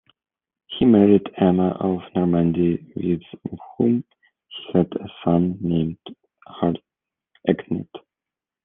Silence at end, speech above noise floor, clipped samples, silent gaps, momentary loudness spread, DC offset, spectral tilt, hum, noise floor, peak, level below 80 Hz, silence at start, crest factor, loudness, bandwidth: 0.65 s; 68 dB; under 0.1%; none; 18 LU; under 0.1%; -11.5 dB/octave; none; -89 dBFS; -2 dBFS; -56 dBFS; 0.7 s; 20 dB; -21 LUFS; 3.8 kHz